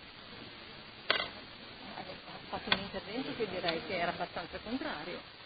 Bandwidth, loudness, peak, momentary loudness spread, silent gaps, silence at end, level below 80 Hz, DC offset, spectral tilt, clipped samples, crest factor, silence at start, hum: 4.9 kHz; -37 LUFS; -10 dBFS; 15 LU; none; 0 s; -62 dBFS; under 0.1%; -1.5 dB/octave; under 0.1%; 28 dB; 0 s; none